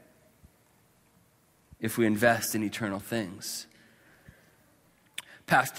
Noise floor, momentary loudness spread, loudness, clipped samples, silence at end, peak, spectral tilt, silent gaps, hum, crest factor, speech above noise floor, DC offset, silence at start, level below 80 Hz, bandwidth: -65 dBFS; 18 LU; -29 LUFS; under 0.1%; 0 s; -8 dBFS; -4 dB/octave; none; none; 24 dB; 37 dB; under 0.1%; 1.8 s; -66 dBFS; 16 kHz